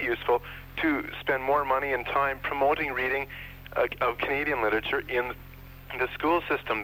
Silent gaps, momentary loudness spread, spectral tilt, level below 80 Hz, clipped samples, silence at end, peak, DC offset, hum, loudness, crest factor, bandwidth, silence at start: none; 11 LU; -6 dB/octave; -50 dBFS; under 0.1%; 0 s; -12 dBFS; under 0.1%; none; -28 LUFS; 16 dB; 17 kHz; 0 s